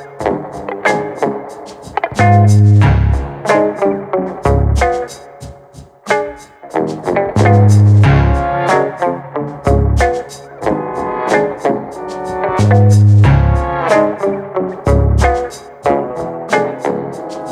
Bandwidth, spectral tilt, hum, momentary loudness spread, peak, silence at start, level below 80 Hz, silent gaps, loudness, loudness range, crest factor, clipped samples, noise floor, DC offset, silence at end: 10.5 kHz; -7.5 dB/octave; none; 15 LU; 0 dBFS; 0 s; -22 dBFS; none; -13 LUFS; 5 LU; 12 dB; under 0.1%; -38 dBFS; under 0.1%; 0 s